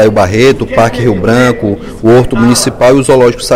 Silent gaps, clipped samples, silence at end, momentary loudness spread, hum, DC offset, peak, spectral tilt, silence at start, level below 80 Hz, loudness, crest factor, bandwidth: none; 2%; 0 s; 4 LU; none; under 0.1%; 0 dBFS; -5.5 dB/octave; 0 s; -28 dBFS; -8 LUFS; 8 dB; 16.5 kHz